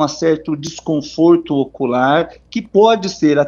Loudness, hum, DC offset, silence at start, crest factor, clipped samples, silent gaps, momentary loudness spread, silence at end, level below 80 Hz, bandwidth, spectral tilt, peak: -15 LUFS; none; under 0.1%; 0 s; 14 dB; under 0.1%; none; 11 LU; 0 s; -52 dBFS; 7.2 kHz; -5.5 dB/octave; 0 dBFS